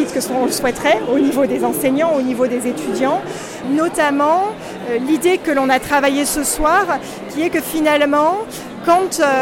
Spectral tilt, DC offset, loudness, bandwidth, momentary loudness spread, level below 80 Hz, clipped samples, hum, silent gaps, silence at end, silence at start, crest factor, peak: -3.5 dB/octave; under 0.1%; -16 LUFS; 17 kHz; 8 LU; -42 dBFS; under 0.1%; none; none; 0 s; 0 s; 12 dB; -4 dBFS